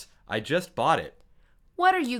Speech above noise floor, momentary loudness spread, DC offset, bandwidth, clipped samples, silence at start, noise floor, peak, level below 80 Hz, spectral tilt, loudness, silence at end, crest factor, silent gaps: 33 dB; 16 LU; under 0.1%; 16 kHz; under 0.1%; 0 s; -59 dBFS; -8 dBFS; -60 dBFS; -4.5 dB/octave; -26 LUFS; 0 s; 20 dB; none